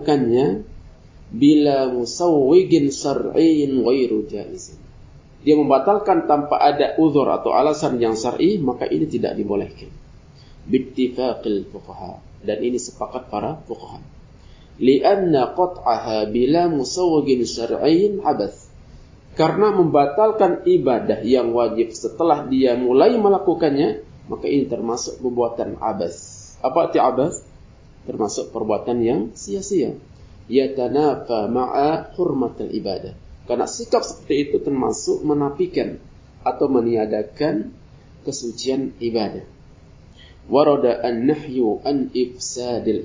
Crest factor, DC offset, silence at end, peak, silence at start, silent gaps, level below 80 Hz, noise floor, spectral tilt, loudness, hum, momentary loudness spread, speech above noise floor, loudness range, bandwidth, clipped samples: 18 dB; under 0.1%; 0 s; -2 dBFS; 0 s; none; -48 dBFS; -45 dBFS; -6 dB/octave; -19 LUFS; none; 12 LU; 27 dB; 7 LU; 7.6 kHz; under 0.1%